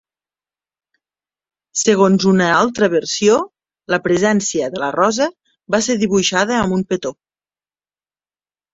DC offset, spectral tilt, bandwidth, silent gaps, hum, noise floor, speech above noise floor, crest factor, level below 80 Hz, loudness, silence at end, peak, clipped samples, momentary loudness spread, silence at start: under 0.1%; -4 dB/octave; 8 kHz; none; 50 Hz at -40 dBFS; under -90 dBFS; over 75 dB; 16 dB; -54 dBFS; -16 LUFS; 1.6 s; -2 dBFS; under 0.1%; 8 LU; 1.75 s